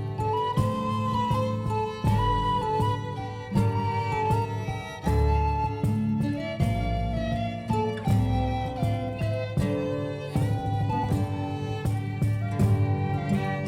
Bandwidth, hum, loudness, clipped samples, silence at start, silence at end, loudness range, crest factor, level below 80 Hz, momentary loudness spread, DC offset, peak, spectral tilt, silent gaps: 14.5 kHz; none; -27 LUFS; under 0.1%; 0 s; 0 s; 2 LU; 14 dB; -38 dBFS; 5 LU; under 0.1%; -12 dBFS; -7.5 dB/octave; none